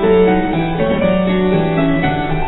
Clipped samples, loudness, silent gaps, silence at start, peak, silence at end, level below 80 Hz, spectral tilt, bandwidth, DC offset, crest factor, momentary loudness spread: under 0.1%; -15 LUFS; none; 0 s; -2 dBFS; 0 s; -28 dBFS; -11 dB/octave; 4.1 kHz; under 0.1%; 12 dB; 4 LU